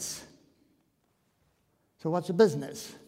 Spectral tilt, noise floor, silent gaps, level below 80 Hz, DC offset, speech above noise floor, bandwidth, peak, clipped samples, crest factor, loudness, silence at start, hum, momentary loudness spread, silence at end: -5 dB/octave; -73 dBFS; none; -72 dBFS; under 0.1%; 45 dB; 16 kHz; -10 dBFS; under 0.1%; 22 dB; -29 LUFS; 0 s; none; 15 LU; 0.1 s